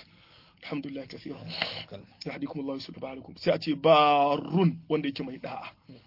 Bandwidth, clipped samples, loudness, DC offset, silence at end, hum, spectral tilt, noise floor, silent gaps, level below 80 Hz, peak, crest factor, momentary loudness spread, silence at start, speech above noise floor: 5.8 kHz; under 0.1%; -27 LUFS; under 0.1%; 0.1 s; none; -7.5 dB/octave; -58 dBFS; none; -68 dBFS; -8 dBFS; 22 dB; 19 LU; 0.6 s; 29 dB